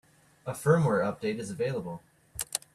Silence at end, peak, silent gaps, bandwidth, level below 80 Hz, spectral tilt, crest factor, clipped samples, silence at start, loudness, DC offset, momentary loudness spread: 0.15 s; -10 dBFS; none; 15 kHz; -62 dBFS; -5.5 dB/octave; 20 dB; under 0.1%; 0.45 s; -30 LUFS; under 0.1%; 18 LU